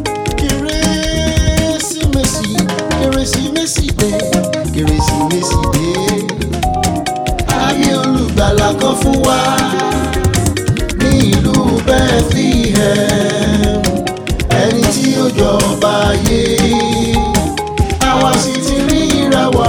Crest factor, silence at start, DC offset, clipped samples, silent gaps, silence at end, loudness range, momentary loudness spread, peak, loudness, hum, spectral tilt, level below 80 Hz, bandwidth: 12 dB; 0 s; under 0.1%; under 0.1%; none; 0 s; 2 LU; 4 LU; 0 dBFS; -13 LUFS; none; -4.5 dB/octave; -22 dBFS; over 20 kHz